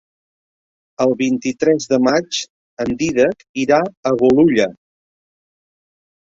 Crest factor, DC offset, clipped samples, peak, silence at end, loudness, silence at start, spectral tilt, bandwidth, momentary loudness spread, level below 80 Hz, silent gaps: 16 dB; under 0.1%; under 0.1%; -2 dBFS; 1.6 s; -17 LUFS; 1 s; -5 dB/octave; 7.8 kHz; 11 LU; -54 dBFS; 2.50-2.77 s, 3.49-3.54 s, 3.97-4.03 s